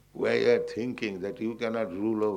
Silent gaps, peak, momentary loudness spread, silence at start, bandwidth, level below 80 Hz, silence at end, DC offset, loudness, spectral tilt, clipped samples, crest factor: none; -12 dBFS; 9 LU; 0.15 s; 10 kHz; -66 dBFS; 0 s; under 0.1%; -29 LUFS; -6 dB/octave; under 0.1%; 18 dB